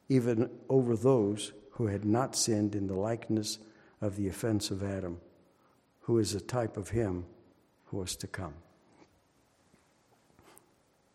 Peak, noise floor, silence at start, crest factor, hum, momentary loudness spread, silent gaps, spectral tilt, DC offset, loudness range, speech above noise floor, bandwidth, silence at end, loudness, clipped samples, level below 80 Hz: -14 dBFS; -69 dBFS; 0.1 s; 20 dB; none; 14 LU; none; -5.5 dB/octave; under 0.1%; 14 LU; 38 dB; 15.5 kHz; 2.55 s; -32 LUFS; under 0.1%; -62 dBFS